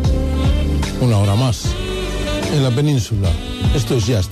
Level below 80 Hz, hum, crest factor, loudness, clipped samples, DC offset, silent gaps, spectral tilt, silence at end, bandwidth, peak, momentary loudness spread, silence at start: -22 dBFS; none; 10 dB; -18 LUFS; under 0.1%; under 0.1%; none; -6 dB/octave; 0 s; 13.5 kHz; -6 dBFS; 6 LU; 0 s